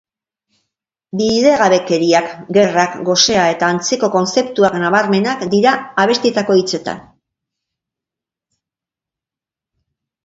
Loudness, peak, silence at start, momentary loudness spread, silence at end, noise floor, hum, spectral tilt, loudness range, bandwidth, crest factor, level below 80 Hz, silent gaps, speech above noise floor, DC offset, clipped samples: -14 LUFS; 0 dBFS; 1.15 s; 5 LU; 3.25 s; -88 dBFS; none; -4 dB/octave; 7 LU; 8 kHz; 16 dB; -56 dBFS; none; 74 dB; under 0.1%; under 0.1%